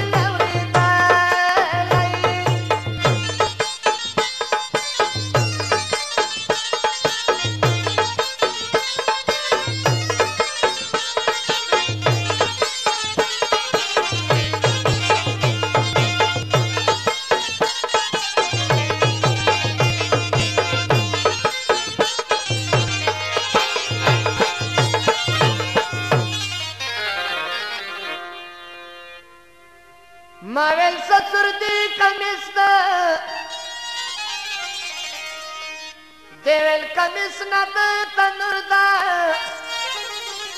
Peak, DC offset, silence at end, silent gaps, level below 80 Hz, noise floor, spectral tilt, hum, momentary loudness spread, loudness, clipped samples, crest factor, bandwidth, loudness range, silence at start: 0 dBFS; 0.2%; 0 s; none; -50 dBFS; -48 dBFS; -3.5 dB/octave; none; 9 LU; -19 LUFS; under 0.1%; 20 dB; 13 kHz; 5 LU; 0 s